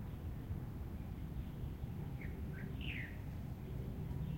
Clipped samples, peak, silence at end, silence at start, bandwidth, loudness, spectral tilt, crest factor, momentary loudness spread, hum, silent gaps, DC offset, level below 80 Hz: under 0.1%; -30 dBFS; 0 s; 0 s; 16.5 kHz; -46 LUFS; -7.5 dB/octave; 14 dB; 3 LU; none; none; under 0.1%; -50 dBFS